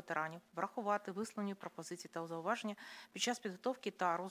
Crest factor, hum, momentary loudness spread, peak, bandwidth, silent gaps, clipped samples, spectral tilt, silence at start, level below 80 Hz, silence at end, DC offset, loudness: 18 dB; none; 10 LU; -22 dBFS; 16 kHz; none; under 0.1%; -3.5 dB/octave; 0 s; under -90 dBFS; 0 s; under 0.1%; -42 LUFS